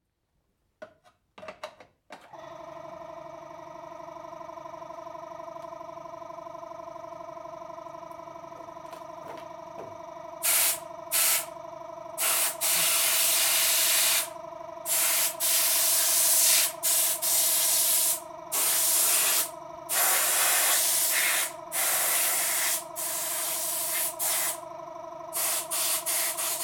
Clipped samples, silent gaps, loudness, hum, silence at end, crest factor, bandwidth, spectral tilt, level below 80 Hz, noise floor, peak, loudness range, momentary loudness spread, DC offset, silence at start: under 0.1%; none; -23 LUFS; none; 0 s; 20 dB; 19.5 kHz; 1.5 dB/octave; -72 dBFS; -76 dBFS; -10 dBFS; 21 LU; 22 LU; under 0.1%; 0.8 s